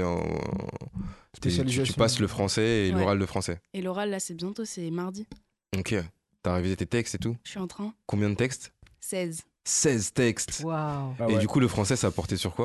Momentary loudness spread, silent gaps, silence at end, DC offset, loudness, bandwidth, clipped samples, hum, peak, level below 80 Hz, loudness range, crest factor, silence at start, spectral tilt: 12 LU; none; 0 s; under 0.1%; -28 LUFS; 12.5 kHz; under 0.1%; none; -10 dBFS; -46 dBFS; 5 LU; 18 dB; 0 s; -4.5 dB/octave